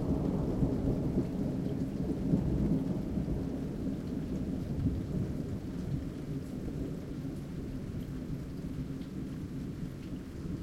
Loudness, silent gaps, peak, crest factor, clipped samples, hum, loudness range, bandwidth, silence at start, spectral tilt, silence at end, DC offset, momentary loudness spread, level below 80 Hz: -36 LUFS; none; -16 dBFS; 20 dB; under 0.1%; none; 7 LU; 16 kHz; 0 s; -9 dB/octave; 0 s; under 0.1%; 9 LU; -44 dBFS